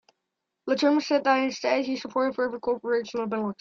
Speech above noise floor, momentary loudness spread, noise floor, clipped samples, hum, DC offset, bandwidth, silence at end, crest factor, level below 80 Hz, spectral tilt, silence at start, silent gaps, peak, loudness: 57 dB; 7 LU; -83 dBFS; under 0.1%; none; under 0.1%; 7.4 kHz; 0.05 s; 18 dB; -70 dBFS; -4.5 dB/octave; 0.65 s; none; -8 dBFS; -26 LUFS